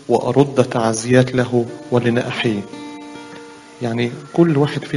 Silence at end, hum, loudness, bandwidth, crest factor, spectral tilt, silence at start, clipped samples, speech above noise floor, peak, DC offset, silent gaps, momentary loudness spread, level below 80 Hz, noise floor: 0 s; none; -18 LUFS; 11.5 kHz; 18 dB; -6 dB/octave; 0 s; under 0.1%; 21 dB; 0 dBFS; under 0.1%; none; 19 LU; -54 dBFS; -38 dBFS